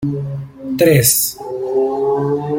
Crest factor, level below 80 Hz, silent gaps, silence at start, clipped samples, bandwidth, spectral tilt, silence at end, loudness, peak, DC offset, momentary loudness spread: 16 dB; -48 dBFS; none; 0 s; under 0.1%; 17 kHz; -4.5 dB/octave; 0 s; -15 LUFS; 0 dBFS; under 0.1%; 14 LU